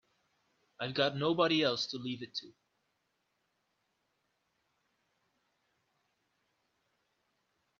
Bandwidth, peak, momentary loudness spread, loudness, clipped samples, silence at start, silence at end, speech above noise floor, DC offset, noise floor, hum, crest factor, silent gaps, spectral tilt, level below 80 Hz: 7.4 kHz; -14 dBFS; 13 LU; -33 LUFS; under 0.1%; 0.8 s; 5.3 s; 48 dB; under 0.1%; -81 dBFS; none; 24 dB; none; -3 dB/octave; -80 dBFS